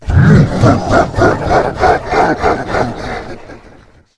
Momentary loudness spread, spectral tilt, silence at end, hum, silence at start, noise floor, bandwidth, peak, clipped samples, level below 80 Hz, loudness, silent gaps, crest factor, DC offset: 15 LU; -7.5 dB/octave; 0.6 s; none; 0 s; -41 dBFS; 11 kHz; 0 dBFS; 0.2%; -26 dBFS; -11 LUFS; none; 12 dB; under 0.1%